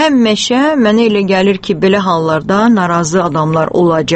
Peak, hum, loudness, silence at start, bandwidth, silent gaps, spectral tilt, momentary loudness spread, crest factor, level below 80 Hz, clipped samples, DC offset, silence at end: 0 dBFS; none; -11 LUFS; 0 s; 8.8 kHz; none; -5.5 dB/octave; 3 LU; 10 dB; -44 dBFS; under 0.1%; under 0.1%; 0 s